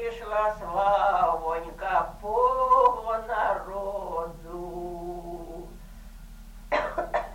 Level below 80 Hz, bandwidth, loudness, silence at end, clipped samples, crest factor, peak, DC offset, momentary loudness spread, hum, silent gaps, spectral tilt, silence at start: -46 dBFS; 16.5 kHz; -27 LUFS; 0 s; under 0.1%; 18 dB; -10 dBFS; under 0.1%; 17 LU; none; none; -5.5 dB/octave; 0 s